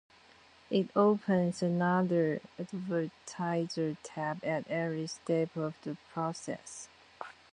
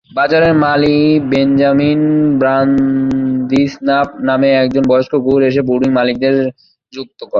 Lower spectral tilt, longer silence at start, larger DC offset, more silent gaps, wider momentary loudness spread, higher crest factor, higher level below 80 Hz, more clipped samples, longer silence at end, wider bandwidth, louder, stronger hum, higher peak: second, -6.5 dB/octave vs -8 dB/octave; first, 0.7 s vs 0.15 s; neither; neither; first, 14 LU vs 5 LU; first, 20 dB vs 10 dB; second, -74 dBFS vs -46 dBFS; neither; first, 0.2 s vs 0 s; first, 10.5 kHz vs 6.8 kHz; second, -33 LUFS vs -12 LUFS; neither; second, -12 dBFS vs -2 dBFS